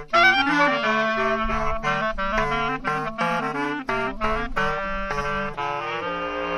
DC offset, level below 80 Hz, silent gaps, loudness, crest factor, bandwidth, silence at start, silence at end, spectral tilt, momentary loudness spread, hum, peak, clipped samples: under 0.1%; -36 dBFS; none; -23 LUFS; 18 dB; 14 kHz; 0 s; 0 s; -4.5 dB/octave; 9 LU; none; -4 dBFS; under 0.1%